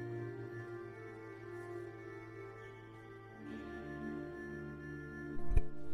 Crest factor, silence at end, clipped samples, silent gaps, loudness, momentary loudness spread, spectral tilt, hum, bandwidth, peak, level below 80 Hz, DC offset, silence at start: 22 dB; 0 s; under 0.1%; none; -46 LUFS; 12 LU; -8 dB/octave; none; 11 kHz; -18 dBFS; -46 dBFS; under 0.1%; 0 s